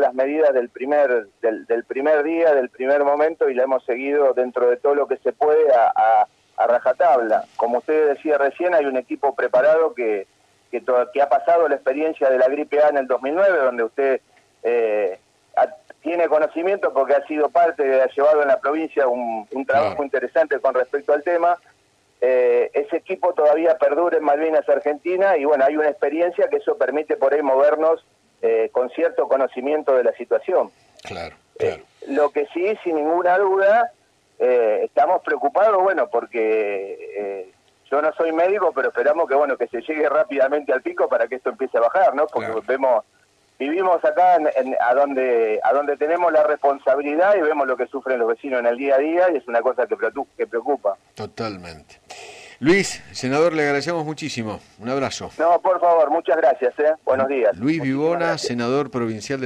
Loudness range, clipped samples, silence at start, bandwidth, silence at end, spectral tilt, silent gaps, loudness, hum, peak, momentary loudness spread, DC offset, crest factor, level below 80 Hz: 4 LU; under 0.1%; 0 s; 10 kHz; 0 s; -5.5 dB/octave; none; -20 LUFS; none; -8 dBFS; 9 LU; under 0.1%; 12 dB; -66 dBFS